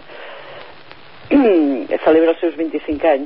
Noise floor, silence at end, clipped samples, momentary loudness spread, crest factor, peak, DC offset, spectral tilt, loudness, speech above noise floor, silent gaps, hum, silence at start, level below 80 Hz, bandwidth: -41 dBFS; 0 s; under 0.1%; 21 LU; 14 dB; -2 dBFS; 0.8%; -10.5 dB/octave; -16 LUFS; 26 dB; none; none; 0.1 s; -50 dBFS; 5.6 kHz